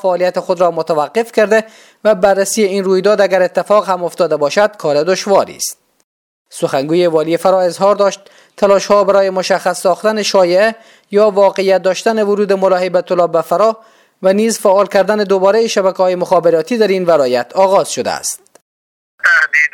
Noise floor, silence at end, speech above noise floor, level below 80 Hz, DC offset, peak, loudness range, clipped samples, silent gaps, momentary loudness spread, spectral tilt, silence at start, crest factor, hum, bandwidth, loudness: under -90 dBFS; 0.05 s; over 78 dB; -58 dBFS; under 0.1%; 0 dBFS; 3 LU; under 0.1%; 6.04-6.45 s, 18.62-19.18 s; 6 LU; -4 dB/octave; 0.05 s; 12 dB; none; 17 kHz; -13 LUFS